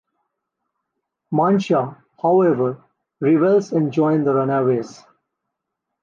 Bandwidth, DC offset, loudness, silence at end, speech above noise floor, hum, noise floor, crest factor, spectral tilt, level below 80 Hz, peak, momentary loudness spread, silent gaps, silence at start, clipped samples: 7.4 kHz; under 0.1%; -18 LUFS; 1.1 s; 63 dB; none; -80 dBFS; 14 dB; -8 dB/octave; -68 dBFS; -6 dBFS; 9 LU; none; 1.3 s; under 0.1%